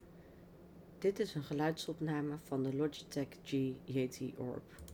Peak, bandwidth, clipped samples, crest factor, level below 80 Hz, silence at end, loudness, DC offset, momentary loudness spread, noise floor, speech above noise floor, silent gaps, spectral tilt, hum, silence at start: -24 dBFS; over 20 kHz; under 0.1%; 16 dB; -68 dBFS; 0 s; -39 LUFS; under 0.1%; 21 LU; -58 dBFS; 19 dB; none; -6.5 dB/octave; none; 0 s